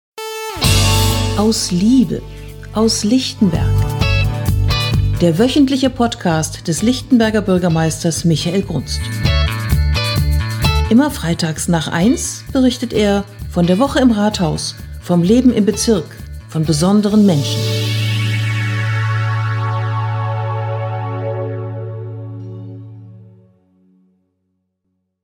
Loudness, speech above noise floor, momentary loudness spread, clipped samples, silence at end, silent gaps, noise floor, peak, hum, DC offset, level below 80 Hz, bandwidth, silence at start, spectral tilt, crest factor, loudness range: -16 LUFS; 56 dB; 12 LU; under 0.1%; 2 s; none; -70 dBFS; 0 dBFS; none; under 0.1%; -28 dBFS; 19 kHz; 0.15 s; -5.5 dB/octave; 16 dB; 8 LU